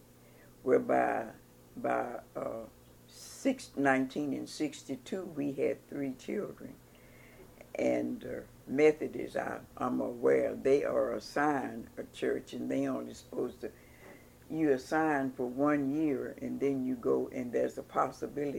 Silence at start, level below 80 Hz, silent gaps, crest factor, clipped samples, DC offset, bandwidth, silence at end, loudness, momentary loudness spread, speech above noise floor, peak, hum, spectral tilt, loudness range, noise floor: 0.4 s; -66 dBFS; none; 20 dB; under 0.1%; under 0.1%; 17 kHz; 0 s; -33 LUFS; 15 LU; 25 dB; -12 dBFS; none; -6 dB/octave; 6 LU; -58 dBFS